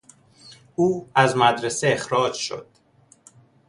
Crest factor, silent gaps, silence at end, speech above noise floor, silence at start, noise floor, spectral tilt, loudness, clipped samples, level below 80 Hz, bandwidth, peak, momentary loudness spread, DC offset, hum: 22 dB; none; 1.05 s; 36 dB; 0.45 s; -57 dBFS; -4 dB/octave; -21 LUFS; under 0.1%; -62 dBFS; 11.5 kHz; -2 dBFS; 12 LU; under 0.1%; none